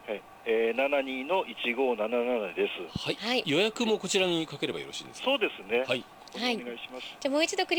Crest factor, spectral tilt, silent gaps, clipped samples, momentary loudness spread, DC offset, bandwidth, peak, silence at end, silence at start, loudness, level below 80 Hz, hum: 18 dB; -3.5 dB/octave; none; under 0.1%; 10 LU; under 0.1%; over 20 kHz; -12 dBFS; 0 s; 0 s; -29 LUFS; -64 dBFS; none